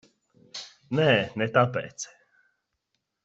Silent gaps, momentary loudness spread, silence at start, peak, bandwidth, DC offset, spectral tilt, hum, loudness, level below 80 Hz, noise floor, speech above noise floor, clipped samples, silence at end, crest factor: none; 18 LU; 0.55 s; -6 dBFS; 8 kHz; under 0.1%; -5 dB/octave; none; -24 LUFS; -68 dBFS; -80 dBFS; 55 dB; under 0.1%; 1.2 s; 24 dB